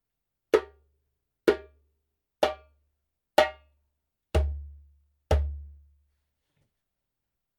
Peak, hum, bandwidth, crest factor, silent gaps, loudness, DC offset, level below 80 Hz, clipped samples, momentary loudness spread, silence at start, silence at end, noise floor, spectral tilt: -4 dBFS; none; 16.5 kHz; 28 dB; none; -28 LUFS; under 0.1%; -38 dBFS; under 0.1%; 19 LU; 0.55 s; 1.85 s; -85 dBFS; -6 dB/octave